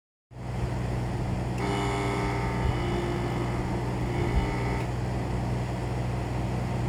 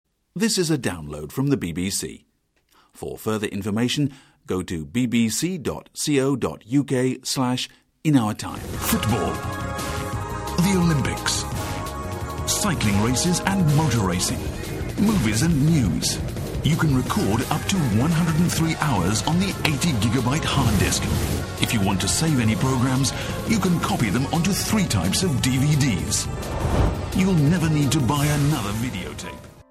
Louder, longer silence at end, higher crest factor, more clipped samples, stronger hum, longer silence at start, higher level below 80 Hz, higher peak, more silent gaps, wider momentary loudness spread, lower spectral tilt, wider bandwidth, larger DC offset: second, -30 LUFS vs -22 LUFS; about the same, 0 s vs 0.1 s; about the same, 14 dB vs 16 dB; neither; neither; about the same, 0.3 s vs 0.35 s; about the same, -36 dBFS vs -36 dBFS; second, -14 dBFS vs -6 dBFS; neither; second, 3 LU vs 9 LU; first, -7 dB/octave vs -5 dB/octave; second, 12.5 kHz vs 16.5 kHz; neither